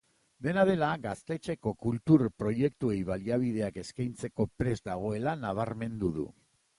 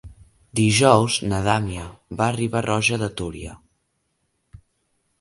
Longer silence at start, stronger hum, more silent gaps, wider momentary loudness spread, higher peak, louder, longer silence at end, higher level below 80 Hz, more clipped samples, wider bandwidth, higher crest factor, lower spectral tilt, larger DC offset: first, 0.4 s vs 0.05 s; neither; neither; second, 11 LU vs 18 LU; second, -10 dBFS vs 0 dBFS; second, -31 LUFS vs -21 LUFS; second, 0.45 s vs 0.65 s; second, -56 dBFS vs -46 dBFS; neither; about the same, 11.5 kHz vs 11.5 kHz; about the same, 20 dB vs 22 dB; first, -7.5 dB/octave vs -4.5 dB/octave; neither